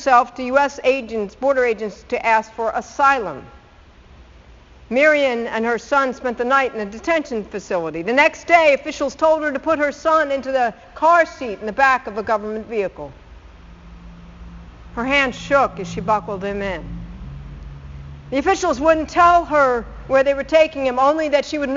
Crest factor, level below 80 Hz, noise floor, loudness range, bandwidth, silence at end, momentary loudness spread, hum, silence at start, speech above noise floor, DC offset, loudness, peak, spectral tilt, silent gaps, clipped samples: 20 dB; -42 dBFS; -46 dBFS; 6 LU; 7.6 kHz; 0 s; 13 LU; none; 0 s; 28 dB; under 0.1%; -18 LUFS; 0 dBFS; -2.5 dB/octave; none; under 0.1%